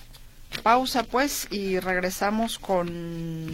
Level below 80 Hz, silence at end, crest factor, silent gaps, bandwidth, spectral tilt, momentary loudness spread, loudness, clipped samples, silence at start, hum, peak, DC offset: -46 dBFS; 0 s; 20 dB; none; 16.5 kHz; -4 dB/octave; 11 LU; -26 LUFS; under 0.1%; 0 s; none; -6 dBFS; under 0.1%